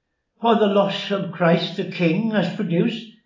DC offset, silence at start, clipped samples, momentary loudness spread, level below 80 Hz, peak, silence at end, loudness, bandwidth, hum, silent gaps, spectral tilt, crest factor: under 0.1%; 0.4 s; under 0.1%; 7 LU; -78 dBFS; -4 dBFS; 0.15 s; -21 LUFS; 7.4 kHz; none; none; -7.5 dB/octave; 18 dB